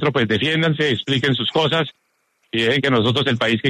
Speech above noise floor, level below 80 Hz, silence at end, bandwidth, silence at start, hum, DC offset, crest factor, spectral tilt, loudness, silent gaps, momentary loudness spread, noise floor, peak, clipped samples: 48 dB; -54 dBFS; 0 s; 13 kHz; 0 s; none; under 0.1%; 14 dB; -6 dB/octave; -18 LUFS; none; 4 LU; -66 dBFS; -4 dBFS; under 0.1%